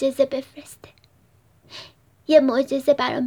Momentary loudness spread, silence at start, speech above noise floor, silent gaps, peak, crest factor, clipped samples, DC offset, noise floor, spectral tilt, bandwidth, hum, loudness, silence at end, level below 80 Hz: 24 LU; 0 s; 38 dB; none; -2 dBFS; 20 dB; under 0.1%; under 0.1%; -58 dBFS; -4.5 dB/octave; 19.5 kHz; none; -20 LUFS; 0 s; -66 dBFS